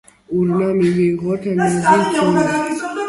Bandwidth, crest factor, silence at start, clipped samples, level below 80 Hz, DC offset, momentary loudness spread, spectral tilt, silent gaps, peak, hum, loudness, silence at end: 11.5 kHz; 16 dB; 0.3 s; under 0.1%; -52 dBFS; under 0.1%; 6 LU; -6 dB/octave; none; 0 dBFS; none; -16 LUFS; 0 s